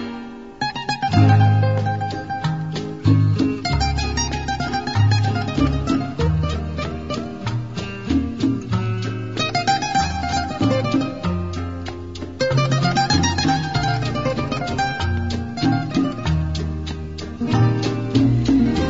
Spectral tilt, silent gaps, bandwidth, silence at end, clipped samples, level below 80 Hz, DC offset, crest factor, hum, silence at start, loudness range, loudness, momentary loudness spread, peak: -6 dB/octave; none; 7.8 kHz; 0 s; under 0.1%; -34 dBFS; 0.5%; 18 dB; none; 0 s; 4 LU; -21 LUFS; 10 LU; -2 dBFS